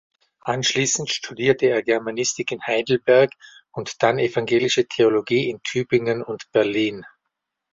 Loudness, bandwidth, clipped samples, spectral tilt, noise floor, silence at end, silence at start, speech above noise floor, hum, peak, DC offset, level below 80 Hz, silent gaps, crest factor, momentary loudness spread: -21 LUFS; 7.8 kHz; under 0.1%; -3.5 dB/octave; -80 dBFS; 0.65 s; 0.45 s; 59 dB; none; -2 dBFS; under 0.1%; -62 dBFS; none; 18 dB; 9 LU